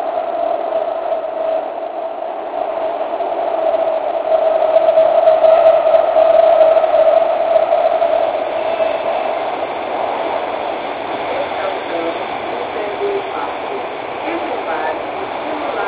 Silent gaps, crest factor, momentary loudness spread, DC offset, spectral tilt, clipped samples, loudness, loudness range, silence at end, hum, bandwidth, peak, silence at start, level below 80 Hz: none; 16 dB; 12 LU; under 0.1%; -7.5 dB/octave; under 0.1%; -16 LUFS; 10 LU; 0 s; none; 4 kHz; 0 dBFS; 0 s; -56 dBFS